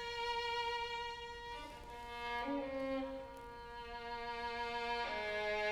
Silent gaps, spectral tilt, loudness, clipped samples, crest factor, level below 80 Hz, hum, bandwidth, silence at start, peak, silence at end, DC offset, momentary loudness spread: none; -3.5 dB/octave; -42 LUFS; under 0.1%; 14 dB; -60 dBFS; none; 16.5 kHz; 0 s; -28 dBFS; 0 s; under 0.1%; 11 LU